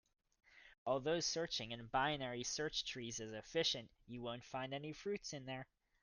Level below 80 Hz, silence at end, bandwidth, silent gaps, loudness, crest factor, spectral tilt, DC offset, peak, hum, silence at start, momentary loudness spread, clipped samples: -70 dBFS; 0.4 s; 10.5 kHz; 0.78-0.86 s; -42 LUFS; 20 dB; -3 dB/octave; under 0.1%; -24 dBFS; none; 0.5 s; 11 LU; under 0.1%